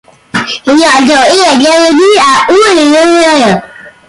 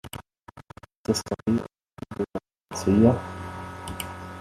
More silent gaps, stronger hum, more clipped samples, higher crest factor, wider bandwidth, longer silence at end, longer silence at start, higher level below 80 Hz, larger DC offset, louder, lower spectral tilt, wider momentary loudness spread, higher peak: second, none vs 0.97-1.04 s; neither; neither; second, 6 dB vs 22 dB; second, 11.5 kHz vs 14 kHz; first, 0.2 s vs 0 s; first, 0.35 s vs 0.05 s; first, -44 dBFS vs -54 dBFS; neither; first, -6 LUFS vs -27 LUFS; second, -3 dB/octave vs -6 dB/octave; second, 8 LU vs 23 LU; first, 0 dBFS vs -4 dBFS